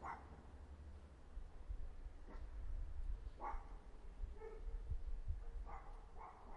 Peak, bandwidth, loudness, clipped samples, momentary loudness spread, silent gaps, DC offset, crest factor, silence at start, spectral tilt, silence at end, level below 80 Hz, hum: -32 dBFS; 7.4 kHz; -55 LUFS; under 0.1%; 9 LU; none; under 0.1%; 18 dB; 0 s; -7 dB/octave; 0 s; -50 dBFS; none